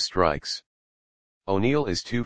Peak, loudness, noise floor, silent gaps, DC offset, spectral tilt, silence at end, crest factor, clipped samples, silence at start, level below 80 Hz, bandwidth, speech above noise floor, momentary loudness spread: -4 dBFS; -26 LUFS; under -90 dBFS; 0.66-1.41 s; under 0.1%; -5 dB/octave; 0 s; 22 dB; under 0.1%; 0 s; -48 dBFS; 10 kHz; over 65 dB; 11 LU